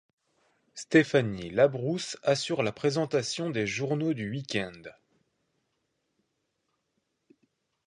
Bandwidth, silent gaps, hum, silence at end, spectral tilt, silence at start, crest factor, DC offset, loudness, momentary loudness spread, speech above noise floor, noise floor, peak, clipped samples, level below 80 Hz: 11 kHz; none; none; 2.95 s; -5 dB/octave; 0.75 s; 24 dB; under 0.1%; -28 LUFS; 9 LU; 51 dB; -79 dBFS; -8 dBFS; under 0.1%; -66 dBFS